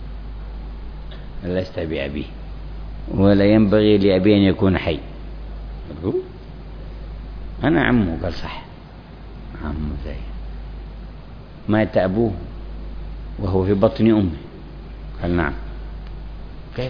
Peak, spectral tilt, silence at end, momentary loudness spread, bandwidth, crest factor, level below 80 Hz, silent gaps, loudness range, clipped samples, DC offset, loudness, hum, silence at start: -2 dBFS; -9.5 dB/octave; 0 s; 22 LU; 5.4 kHz; 18 dB; -34 dBFS; none; 9 LU; under 0.1%; under 0.1%; -19 LUFS; none; 0 s